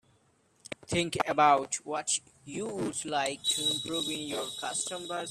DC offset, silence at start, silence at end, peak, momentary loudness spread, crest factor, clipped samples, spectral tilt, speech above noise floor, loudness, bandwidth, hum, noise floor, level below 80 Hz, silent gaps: under 0.1%; 0.9 s; 0 s; -10 dBFS; 12 LU; 22 dB; under 0.1%; -2.5 dB/octave; 37 dB; -30 LUFS; 14.5 kHz; none; -68 dBFS; -66 dBFS; none